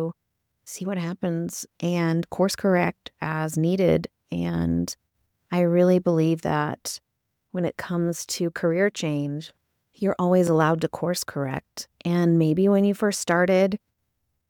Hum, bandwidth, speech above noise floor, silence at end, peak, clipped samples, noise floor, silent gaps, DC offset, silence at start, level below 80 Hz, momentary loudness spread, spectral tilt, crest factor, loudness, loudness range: none; 18.5 kHz; 54 dB; 0.75 s; -8 dBFS; under 0.1%; -77 dBFS; none; under 0.1%; 0 s; -56 dBFS; 13 LU; -6 dB/octave; 16 dB; -24 LUFS; 4 LU